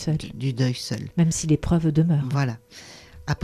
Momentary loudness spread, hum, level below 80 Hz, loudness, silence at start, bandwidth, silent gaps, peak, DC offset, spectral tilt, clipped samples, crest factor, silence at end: 18 LU; none; -42 dBFS; -23 LUFS; 0 s; 13 kHz; none; -8 dBFS; under 0.1%; -6 dB/octave; under 0.1%; 16 dB; 0 s